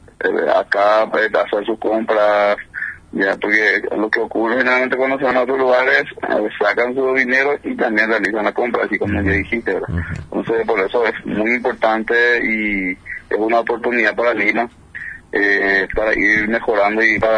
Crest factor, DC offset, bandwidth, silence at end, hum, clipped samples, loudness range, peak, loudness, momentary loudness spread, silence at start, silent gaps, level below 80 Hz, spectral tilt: 16 dB; under 0.1%; 10.5 kHz; 0 s; none; under 0.1%; 3 LU; 0 dBFS; -16 LUFS; 8 LU; 0.2 s; none; -42 dBFS; -6 dB/octave